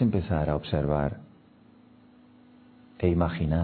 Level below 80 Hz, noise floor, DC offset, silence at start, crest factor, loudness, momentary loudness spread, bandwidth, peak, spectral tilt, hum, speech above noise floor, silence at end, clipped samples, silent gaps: -42 dBFS; -56 dBFS; under 0.1%; 0 s; 18 dB; -27 LUFS; 5 LU; 4.5 kHz; -10 dBFS; -12 dB/octave; none; 30 dB; 0 s; under 0.1%; none